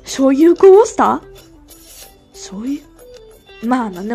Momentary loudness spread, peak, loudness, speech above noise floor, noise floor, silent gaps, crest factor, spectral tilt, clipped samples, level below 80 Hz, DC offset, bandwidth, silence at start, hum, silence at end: 19 LU; 0 dBFS; -12 LUFS; 30 dB; -42 dBFS; none; 14 dB; -5 dB/octave; 0.2%; -48 dBFS; under 0.1%; 14.5 kHz; 0.05 s; none; 0 s